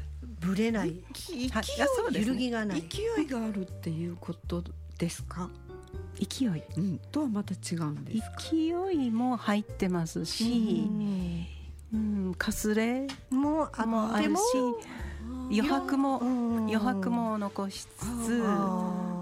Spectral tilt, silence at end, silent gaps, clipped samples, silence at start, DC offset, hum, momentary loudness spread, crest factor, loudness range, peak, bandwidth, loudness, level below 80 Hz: -5.5 dB/octave; 0 s; none; under 0.1%; 0 s; under 0.1%; none; 10 LU; 16 dB; 5 LU; -14 dBFS; 16 kHz; -31 LUFS; -48 dBFS